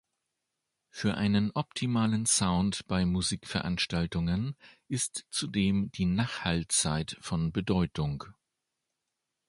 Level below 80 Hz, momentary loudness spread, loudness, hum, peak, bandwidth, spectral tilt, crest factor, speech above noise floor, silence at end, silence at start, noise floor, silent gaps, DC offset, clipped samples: -48 dBFS; 8 LU; -30 LUFS; none; -12 dBFS; 11.5 kHz; -4.5 dB/octave; 20 dB; 55 dB; 1.15 s; 0.95 s; -85 dBFS; none; under 0.1%; under 0.1%